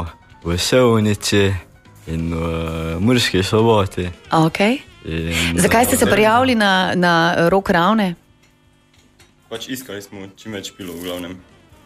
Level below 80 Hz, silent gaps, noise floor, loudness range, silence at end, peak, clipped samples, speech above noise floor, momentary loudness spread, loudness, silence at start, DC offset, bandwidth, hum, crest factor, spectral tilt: -40 dBFS; none; -54 dBFS; 12 LU; 0.45 s; -2 dBFS; under 0.1%; 37 dB; 17 LU; -17 LUFS; 0 s; under 0.1%; 15.5 kHz; none; 16 dB; -4.5 dB/octave